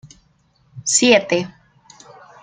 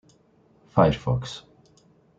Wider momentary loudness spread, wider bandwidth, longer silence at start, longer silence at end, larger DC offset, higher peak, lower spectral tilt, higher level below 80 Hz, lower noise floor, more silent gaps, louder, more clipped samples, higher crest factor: about the same, 15 LU vs 17 LU; first, 9.8 kHz vs 7.8 kHz; second, 0.05 s vs 0.75 s; first, 0.95 s vs 0.8 s; neither; about the same, -2 dBFS vs -4 dBFS; second, -2 dB/octave vs -7.5 dB/octave; second, -62 dBFS vs -48 dBFS; about the same, -59 dBFS vs -60 dBFS; neither; first, -16 LUFS vs -23 LUFS; neither; about the same, 20 dB vs 22 dB